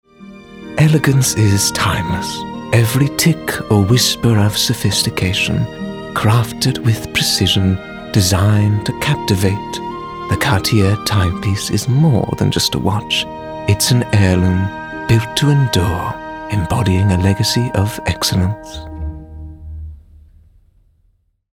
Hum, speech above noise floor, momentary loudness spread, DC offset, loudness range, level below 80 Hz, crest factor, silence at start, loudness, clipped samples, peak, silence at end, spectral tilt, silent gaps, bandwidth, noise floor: none; 45 dB; 13 LU; under 0.1%; 3 LU; -36 dBFS; 16 dB; 0.2 s; -15 LUFS; under 0.1%; 0 dBFS; 1.6 s; -4.5 dB/octave; none; 17 kHz; -59 dBFS